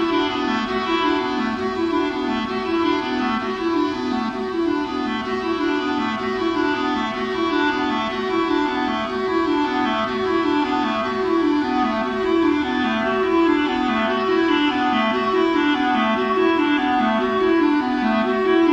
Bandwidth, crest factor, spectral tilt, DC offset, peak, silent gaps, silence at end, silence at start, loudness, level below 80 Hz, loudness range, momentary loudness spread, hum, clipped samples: 8 kHz; 14 dB; -5.5 dB/octave; under 0.1%; -6 dBFS; none; 0 s; 0 s; -20 LUFS; -48 dBFS; 4 LU; 5 LU; none; under 0.1%